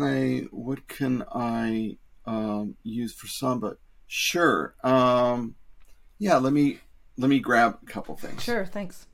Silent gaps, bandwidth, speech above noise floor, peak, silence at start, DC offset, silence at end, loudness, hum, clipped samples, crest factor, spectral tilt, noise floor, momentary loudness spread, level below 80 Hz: none; 16.5 kHz; 23 dB; -8 dBFS; 0 s; under 0.1%; 0.1 s; -26 LUFS; none; under 0.1%; 18 dB; -5 dB/octave; -49 dBFS; 15 LU; -54 dBFS